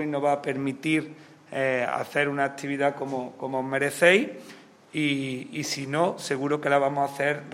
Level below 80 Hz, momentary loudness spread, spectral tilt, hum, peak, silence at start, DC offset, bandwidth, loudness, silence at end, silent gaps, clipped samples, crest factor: -74 dBFS; 10 LU; -4.5 dB/octave; none; -4 dBFS; 0 s; under 0.1%; 16 kHz; -26 LUFS; 0 s; none; under 0.1%; 22 dB